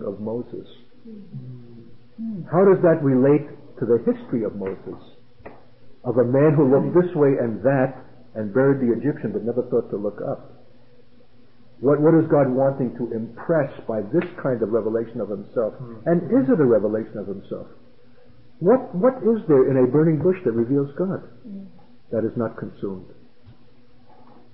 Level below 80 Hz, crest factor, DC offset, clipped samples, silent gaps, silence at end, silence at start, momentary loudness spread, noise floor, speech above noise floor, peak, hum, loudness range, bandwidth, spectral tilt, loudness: -60 dBFS; 14 dB; 0.6%; under 0.1%; none; 1 s; 0 s; 18 LU; -55 dBFS; 34 dB; -6 dBFS; none; 5 LU; 5.2 kHz; -13.5 dB/octave; -21 LUFS